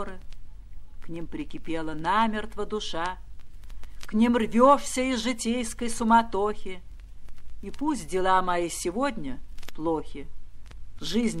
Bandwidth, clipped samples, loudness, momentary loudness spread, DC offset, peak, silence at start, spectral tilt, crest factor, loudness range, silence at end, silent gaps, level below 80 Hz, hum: 13.5 kHz; under 0.1%; -26 LUFS; 21 LU; under 0.1%; -6 dBFS; 0 s; -4.5 dB/octave; 22 dB; 7 LU; 0 s; none; -42 dBFS; none